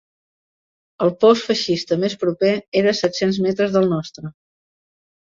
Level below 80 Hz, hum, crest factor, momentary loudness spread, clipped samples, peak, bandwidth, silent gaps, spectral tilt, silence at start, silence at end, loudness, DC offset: -60 dBFS; none; 18 dB; 8 LU; under 0.1%; -4 dBFS; 7.6 kHz; 2.68-2.72 s; -5.5 dB/octave; 1 s; 1.05 s; -19 LUFS; under 0.1%